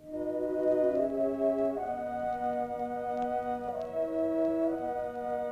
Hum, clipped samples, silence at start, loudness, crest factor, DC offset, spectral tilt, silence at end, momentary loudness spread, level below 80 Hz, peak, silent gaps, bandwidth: none; under 0.1%; 0 s; -32 LUFS; 14 dB; under 0.1%; -7.5 dB/octave; 0 s; 7 LU; -62 dBFS; -16 dBFS; none; 12 kHz